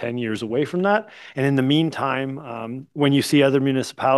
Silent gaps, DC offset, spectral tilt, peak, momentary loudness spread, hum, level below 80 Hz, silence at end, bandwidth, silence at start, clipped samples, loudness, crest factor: none; under 0.1%; -6 dB/octave; -4 dBFS; 14 LU; none; -66 dBFS; 0 s; 12.5 kHz; 0 s; under 0.1%; -21 LUFS; 16 dB